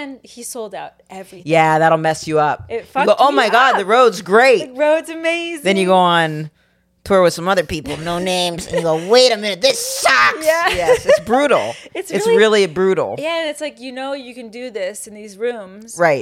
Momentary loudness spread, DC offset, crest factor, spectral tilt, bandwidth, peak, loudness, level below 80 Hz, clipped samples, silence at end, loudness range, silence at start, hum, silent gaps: 17 LU; under 0.1%; 16 dB; -3.5 dB/octave; 16.5 kHz; 0 dBFS; -15 LUFS; -50 dBFS; under 0.1%; 0 s; 4 LU; 0 s; none; none